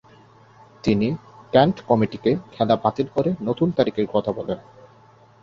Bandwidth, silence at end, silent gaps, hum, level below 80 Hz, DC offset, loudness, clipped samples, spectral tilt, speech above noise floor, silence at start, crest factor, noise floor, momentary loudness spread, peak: 7.4 kHz; 0.8 s; none; none; -54 dBFS; under 0.1%; -22 LUFS; under 0.1%; -8 dB/octave; 31 dB; 0.85 s; 22 dB; -51 dBFS; 9 LU; -2 dBFS